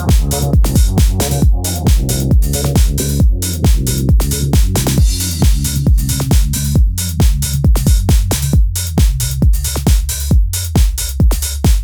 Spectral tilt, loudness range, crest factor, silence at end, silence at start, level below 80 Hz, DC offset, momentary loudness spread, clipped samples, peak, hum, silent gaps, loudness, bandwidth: -5 dB/octave; 1 LU; 12 dB; 0 s; 0 s; -14 dBFS; under 0.1%; 2 LU; under 0.1%; 0 dBFS; none; none; -14 LUFS; over 20 kHz